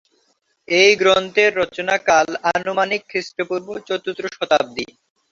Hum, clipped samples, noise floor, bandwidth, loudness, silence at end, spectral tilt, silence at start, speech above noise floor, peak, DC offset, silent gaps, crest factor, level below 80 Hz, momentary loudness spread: none; under 0.1%; -65 dBFS; 7.8 kHz; -18 LUFS; 0.45 s; -2.5 dB/octave; 0.7 s; 46 dB; -2 dBFS; under 0.1%; none; 18 dB; -60 dBFS; 13 LU